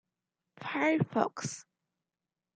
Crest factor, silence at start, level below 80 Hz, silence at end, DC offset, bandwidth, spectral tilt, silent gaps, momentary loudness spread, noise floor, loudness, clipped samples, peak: 24 dB; 0.6 s; -76 dBFS; 0.95 s; under 0.1%; 9.4 kHz; -5.5 dB/octave; none; 15 LU; under -90 dBFS; -32 LUFS; under 0.1%; -12 dBFS